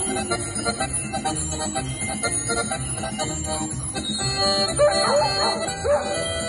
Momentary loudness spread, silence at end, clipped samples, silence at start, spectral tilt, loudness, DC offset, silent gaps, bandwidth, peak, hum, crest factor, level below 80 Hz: 7 LU; 0 s; under 0.1%; 0 s; -3 dB/octave; -23 LUFS; under 0.1%; none; 12 kHz; -8 dBFS; none; 16 dB; -42 dBFS